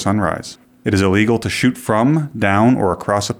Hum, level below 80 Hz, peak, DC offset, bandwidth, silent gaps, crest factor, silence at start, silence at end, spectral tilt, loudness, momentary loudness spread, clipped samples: none; -46 dBFS; -2 dBFS; under 0.1%; 16.5 kHz; none; 16 dB; 0 s; 0.05 s; -6 dB/octave; -16 LUFS; 8 LU; under 0.1%